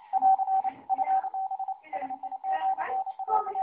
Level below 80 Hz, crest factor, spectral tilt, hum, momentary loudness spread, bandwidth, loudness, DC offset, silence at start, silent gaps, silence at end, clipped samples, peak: -80 dBFS; 16 dB; -1 dB/octave; none; 11 LU; 3.5 kHz; -29 LUFS; under 0.1%; 0 s; none; 0 s; under 0.1%; -14 dBFS